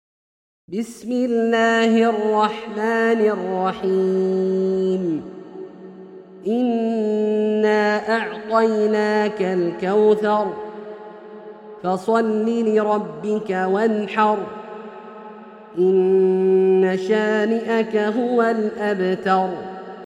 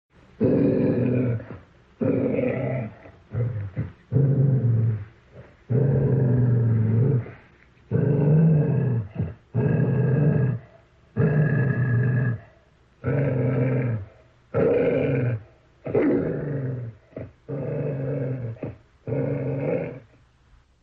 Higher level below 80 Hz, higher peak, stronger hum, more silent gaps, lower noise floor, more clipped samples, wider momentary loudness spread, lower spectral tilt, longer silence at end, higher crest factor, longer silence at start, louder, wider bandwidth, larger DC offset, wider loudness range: second, -66 dBFS vs -52 dBFS; first, -4 dBFS vs -8 dBFS; neither; neither; second, -40 dBFS vs -57 dBFS; neither; first, 19 LU vs 14 LU; second, -6.5 dB/octave vs -12.5 dB/octave; second, 0 s vs 0.85 s; about the same, 16 dB vs 16 dB; first, 0.7 s vs 0.4 s; first, -19 LUFS vs -24 LUFS; first, 10.5 kHz vs 3.2 kHz; neither; second, 4 LU vs 7 LU